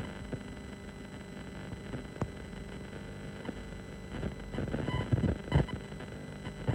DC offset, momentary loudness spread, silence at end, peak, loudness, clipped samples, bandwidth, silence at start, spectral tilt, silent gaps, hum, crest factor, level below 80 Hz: under 0.1%; 13 LU; 0 s; -14 dBFS; -38 LUFS; under 0.1%; 16 kHz; 0 s; -7 dB/octave; none; none; 22 dB; -46 dBFS